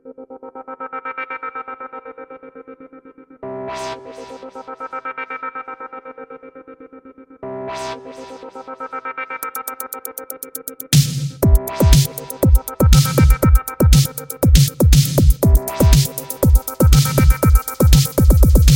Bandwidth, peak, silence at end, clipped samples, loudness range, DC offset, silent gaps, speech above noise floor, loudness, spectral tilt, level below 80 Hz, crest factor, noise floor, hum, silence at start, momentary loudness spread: 17 kHz; 0 dBFS; 0 s; under 0.1%; 17 LU; under 0.1%; none; 10 dB; -16 LUFS; -5.5 dB/octave; -20 dBFS; 16 dB; -42 dBFS; none; 0.05 s; 21 LU